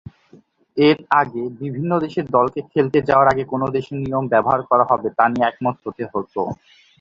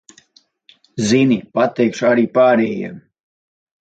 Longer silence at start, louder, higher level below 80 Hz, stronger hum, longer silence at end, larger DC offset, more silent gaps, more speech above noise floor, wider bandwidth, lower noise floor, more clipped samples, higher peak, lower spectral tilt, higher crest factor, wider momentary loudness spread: second, 0.75 s vs 0.95 s; second, -19 LUFS vs -16 LUFS; first, -54 dBFS vs -60 dBFS; neither; second, 0.45 s vs 0.9 s; neither; neither; second, 33 dB vs 40 dB; second, 7.4 kHz vs 9 kHz; second, -51 dBFS vs -56 dBFS; neither; about the same, -2 dBFS vs -2 dBFS; first, -8 dB/octave vs -5.5 dB/octave; about the same, 18 dB vs 16 dB; about the same, 12 LU vs 13 LU